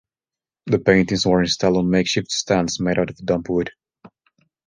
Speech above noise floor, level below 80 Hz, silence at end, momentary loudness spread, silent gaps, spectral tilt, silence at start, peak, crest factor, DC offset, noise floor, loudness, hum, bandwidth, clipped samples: over 71 dB; -46 dBFS; 0.6 s; 7 LU; none; -5 dB/octave; 0.65 s; -2 dBFS; 18 dB; under 0.1%; under -90 dBFS; -19 LUFS; none; 10 kHz; under 0.1%